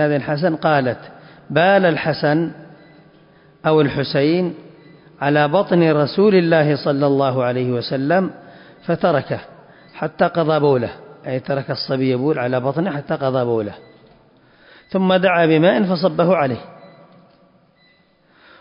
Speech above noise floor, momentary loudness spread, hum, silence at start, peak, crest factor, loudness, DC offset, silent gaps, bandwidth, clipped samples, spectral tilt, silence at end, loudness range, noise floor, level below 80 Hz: 39 dB; 12 LU; none; 0 s; -4 dBFS; 16 dB; -18 LUFS; under 0.1%; none; 5.4 kHz; under 0.1%; -11.5 dB/octave; 1.75 s; 4 LU; -56 dBFS; -58 dBFS